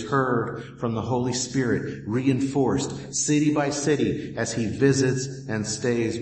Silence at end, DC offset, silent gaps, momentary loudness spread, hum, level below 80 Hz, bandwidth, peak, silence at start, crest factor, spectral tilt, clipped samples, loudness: 0 s; under 0.1%; none; 7 LU; none; -54 dBFS; 8.8 kHz; -8 dBFS; 0 s; 16 dB; -5 dB/octave; under 0.1%; -25 LUFS